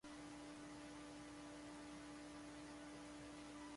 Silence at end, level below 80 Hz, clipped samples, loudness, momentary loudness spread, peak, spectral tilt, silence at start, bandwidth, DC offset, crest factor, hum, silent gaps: 0 s; -72 dBFS; under 0.1%; -56 LUFS; 0 LU; -44 dBFS; -4 dB/octave; 0.05 s; 11.5 kHz; under 0.1%; 10 dB; none; none